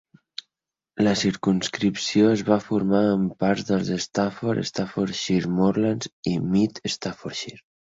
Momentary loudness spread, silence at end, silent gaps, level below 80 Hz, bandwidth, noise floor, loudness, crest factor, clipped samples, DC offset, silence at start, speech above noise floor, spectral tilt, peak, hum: 12 LU; 0.25 s; 6.13-6.23 s; -56 dBFS; 8 kHz; -88 dBFS; -23 LUFS; 18 dB; under 0.1%; under 0.1%; 0.95 s; 65 dB; -5.5 dB/octave; -6 dBFS; none